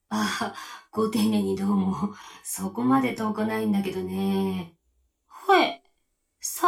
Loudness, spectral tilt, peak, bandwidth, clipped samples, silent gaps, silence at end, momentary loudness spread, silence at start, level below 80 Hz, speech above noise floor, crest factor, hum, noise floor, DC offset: -26 LUFS; -5 dB/octave; -6 dBFS; 17 kHz; under 0.1%; none; 0 s; 13 LU; 0.1 s; -64 dBFS; 48 dB; 20 dB; none; -73 dBFS; under 0.1%